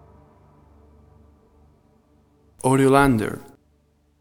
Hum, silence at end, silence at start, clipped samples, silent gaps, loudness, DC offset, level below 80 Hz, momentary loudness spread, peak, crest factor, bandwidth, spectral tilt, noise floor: 50 Hz at -65 dBFS; 0.8 s; 2.65 s; under 0.1%; none; -19 LUFS; under 0.1%; -46 dBFS; 14 LU; -2 dBFS; 22 dB; 16.5 kHz; -6.5 dB/octave; -62 dBFS